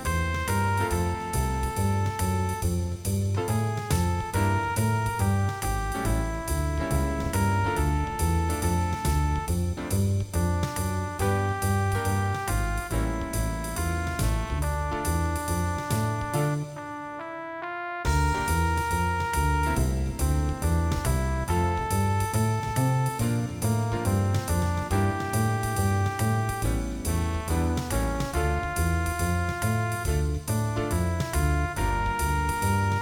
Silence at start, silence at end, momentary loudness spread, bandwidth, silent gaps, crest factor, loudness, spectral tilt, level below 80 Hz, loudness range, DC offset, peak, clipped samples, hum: 0 s; 0 s; 4 LU; 17 kHz; none; 14 dB; -27 LUFS; -5.5 dB/octave; -32 dBFS; 2 LU; under 0.1%; -12 dBFS; under 0.1%; none